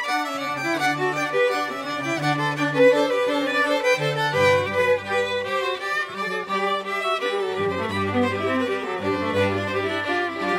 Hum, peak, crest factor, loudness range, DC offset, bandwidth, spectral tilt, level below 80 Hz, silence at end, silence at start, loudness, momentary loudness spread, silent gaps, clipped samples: none; -6 dBFS; 16 dB; 4 LU; under 0.1%; 15.5 kHz; -4.5 dB/octave; -66 dBFS; 0 s; 0 s; -22 LUFS; 6 LU; none; under 0.1%